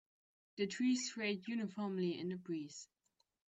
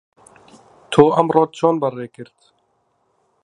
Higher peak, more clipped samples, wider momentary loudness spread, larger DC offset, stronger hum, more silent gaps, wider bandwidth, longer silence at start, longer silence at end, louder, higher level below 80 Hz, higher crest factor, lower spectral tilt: second, -26 dBFS vs 0 dBFS; neither; about the same, 16 LU vs 16 LU; neither; neither; neither; second, 8.4 kHz vs 11 kHz; second, 0.55 s vs 0.9 s; second, 0.65 s vs 1.2 s; second, -40 LUFS vs -16 LUFS; second, -84 dBFS vs -60 dBFS; about the same, 16 dB vs 20 dB; second, -4.5 dB/octave vs -7 dB/octave